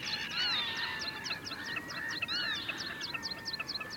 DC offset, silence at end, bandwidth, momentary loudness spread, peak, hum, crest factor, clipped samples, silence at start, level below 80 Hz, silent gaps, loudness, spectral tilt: under 0.1%; 0 s; over 20 kHz; 7 LU; -22 dBFS; none; 16 dB; under 0.1%; 0 s; -66 dBFS; none; -35 LUFS; -1.5 dB/octave